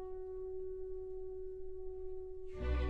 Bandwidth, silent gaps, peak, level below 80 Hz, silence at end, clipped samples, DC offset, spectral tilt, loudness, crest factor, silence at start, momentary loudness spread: 5.6 kHz; none; -26 dBFS; -46 dBFS; 0 s; under 0.1%; 0.1%; -9 dB/octave; -46 LUFS; 16 dB; 0 s; 4 LU